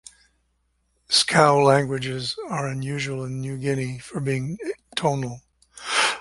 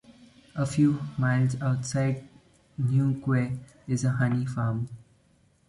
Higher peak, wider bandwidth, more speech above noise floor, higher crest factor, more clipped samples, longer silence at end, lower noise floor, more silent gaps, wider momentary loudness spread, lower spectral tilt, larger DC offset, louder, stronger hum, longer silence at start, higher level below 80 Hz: first, -2 dBFS vs -12 dBFS; about the same, 11.5 kHz vs 11.5 kHz; first, 47 dB vs 38 dB; first, 22 dB vs 16 dB; neither; second, 0 s vs 0.7 s; first, -70 dBFS vs -64 dBFS; neither; first, 14 LU vs 11 LU; second, -4 dB/octave vs -7 dB/octave; neither; first, -23 LUFS vs -27 LUFS; neither; first, 1.1 s vs 0.1 s; about the same, -58 dBFS vs -58 dBFS